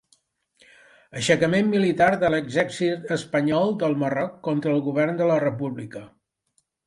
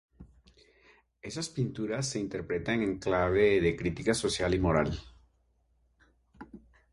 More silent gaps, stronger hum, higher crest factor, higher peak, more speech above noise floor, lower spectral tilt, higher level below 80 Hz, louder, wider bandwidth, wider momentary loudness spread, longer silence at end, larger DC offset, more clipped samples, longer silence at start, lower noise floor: neither; neither; about the same, 20 dB vs 20 dB; first, -4 dBFS vs -12 dBFS; first, 48 dB vs 41 dB; about the same, -6 dB/octave vs -5 dB/octave; second, -60 dBFS vs -48 dBFS; first, -23 LUFS vs -30 LUFS; about the same, 11.5 kHz vs 11.5 kHz; second, 11 LU vs 17 LU; first, 0.8 s vs 0.35 s; neither; neither; first, 1.15 s vs 0.2 s; about the same, -71 dBFS vs -71 dBFS